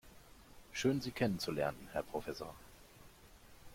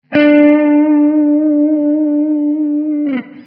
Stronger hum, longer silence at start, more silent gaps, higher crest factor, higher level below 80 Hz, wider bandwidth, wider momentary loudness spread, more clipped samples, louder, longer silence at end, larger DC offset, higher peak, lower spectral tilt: neither; about the same, 0.05 s vs 0.1 s; neither; first, 20 dB vs 12 dB; about the same, -62 dBFS vs -64 dBFS; first, 16.5 kHz vs 4.7 kHz; first, 25 LU vs 8 LU; neither; second, -39 LUFS vs -12 LUFS; about the same, 0 s vs 0.05 s; neither; second, -20 dBFS vs 0 dBFS; about the same, -5 dB/octave vs -4.5 dB/octave